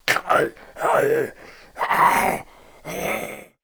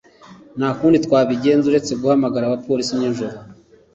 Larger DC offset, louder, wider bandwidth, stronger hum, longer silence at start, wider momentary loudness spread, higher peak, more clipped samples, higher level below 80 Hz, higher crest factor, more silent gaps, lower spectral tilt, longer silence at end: neither; second, -21 LUFS vs -18 LUFS; first, over 20 kHz vs 8 kHz; neither; second, 0.05 s vs 0.3 s; first, 16 LU vs 11 LU; about the same, -2 dBFS vs -4 dBFS; neither; about the same, -52 dBFS vs -56 dBFS; about the same, 20 dB vs 16 dB; neither; second, -3.5 dB/octave vs -6 dB/octave; second, 0.2 s vs 0.4 s